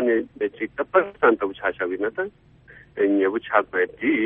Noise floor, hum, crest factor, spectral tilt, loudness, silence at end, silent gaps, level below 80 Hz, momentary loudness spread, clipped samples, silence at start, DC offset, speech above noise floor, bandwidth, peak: -50 dBFS; none; 20 dB; -8.5 dB/octave; -23 LUFS; 0 s; none; -60 dBFS; 9 LU; under 0.1%; 0 s; under 0.1%; 26 dB; 3.8 kHz; -4 dBFS